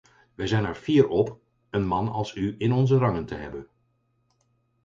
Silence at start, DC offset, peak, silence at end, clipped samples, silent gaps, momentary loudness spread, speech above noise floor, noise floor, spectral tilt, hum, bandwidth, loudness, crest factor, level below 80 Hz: 0.4 s; under 0.1%; -6 dBFS; 1.2 s; under 0.1%; none; 13 LU; 46 dB; -70 dBFS; -8 dB/octave; none; 7.6 kHz; -25 LUFS; 20 dB; -50 dBFS